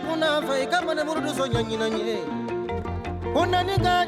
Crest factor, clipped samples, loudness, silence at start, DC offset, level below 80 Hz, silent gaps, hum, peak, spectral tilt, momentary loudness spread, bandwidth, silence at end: 14 dB; under 0.1%; -25 LUFS; 0 s; under 0.1%; -44 dBFS; none; none; -10 dBFS; -5 dB/octave; 7 LU; 15.5 kHz; 0 s